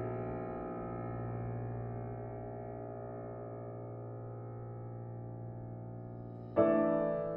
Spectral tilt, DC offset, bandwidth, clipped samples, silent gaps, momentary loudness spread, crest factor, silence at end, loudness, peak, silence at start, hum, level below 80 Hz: -10 dB/octave; under 0.1%; 3.8 kHz; under 0.1%; none; 14 LU; 22 dB; 0 s; -39 LUFS; -16 dBFS; 0 s; none; -60 dBFS